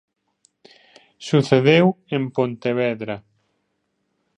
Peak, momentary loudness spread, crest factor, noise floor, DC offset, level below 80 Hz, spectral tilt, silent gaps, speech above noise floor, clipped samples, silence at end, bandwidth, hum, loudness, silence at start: -2 dBFS; 16 LU; 20 dB; -72 dBFS; under 0.1%; -66 dBFS; -7 dB/octave; none; 53 dB; under 0.1%; 1.2 s; 10 kHz; none; -19 LUFS; 1.2 s